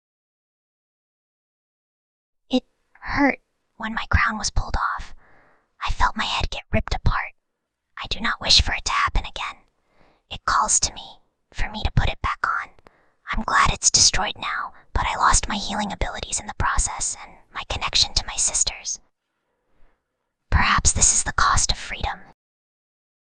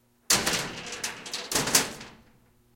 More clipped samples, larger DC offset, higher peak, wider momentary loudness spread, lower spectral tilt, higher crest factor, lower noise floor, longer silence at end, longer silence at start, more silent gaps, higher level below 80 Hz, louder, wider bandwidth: neither; neither; about the same, -2 dBFS vs -4 dBFS; first, 16 LU vs 12 LU; about the same, -2 dB/octave vs -1 dB/octave; about the same, 22 dB vs 26 dB; first, -78 dBFS vs -61 dBFS; first, 1.1 s vs 0.6 s; first, 2.5 s vs 0.3 s; neither; first, -32 dBFS vs -56 dBFS; first, -21 LUFS vs -26 LUFS; second, 10 kHz vs 17 kHz